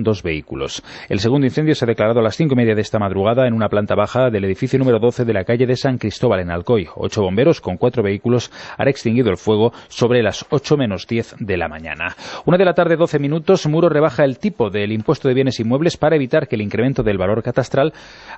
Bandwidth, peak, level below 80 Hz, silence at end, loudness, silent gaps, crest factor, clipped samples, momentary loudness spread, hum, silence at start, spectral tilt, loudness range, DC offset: 8.4 kHz; -2 dBFS; -46 dBFS; 0 s; -17 LUFS; none; 16 dB; under 0.1%; 7 LU; none; 0 s; -7 dB/octave; 2 LU; under 0.1%